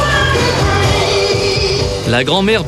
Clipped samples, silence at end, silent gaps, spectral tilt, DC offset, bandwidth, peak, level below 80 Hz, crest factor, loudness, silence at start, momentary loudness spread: under 0.1%; 0 s; none; -4.5 dB/octave; under 0.1%; 14 kHz; -2 dBFS; -26 dBFS; 12 dB; -13 LUFS; 0 s; 3 LU